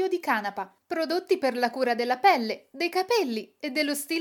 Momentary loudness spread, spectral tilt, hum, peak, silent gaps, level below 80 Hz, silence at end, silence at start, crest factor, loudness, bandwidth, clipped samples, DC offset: 11 LU; -3 dB/octave; none; -8 dBFS; none; -84 dBFS; 0 s; 0 s; 18 dB; -26 LUFS; 19 kHz; under 0.1%; under 0.1%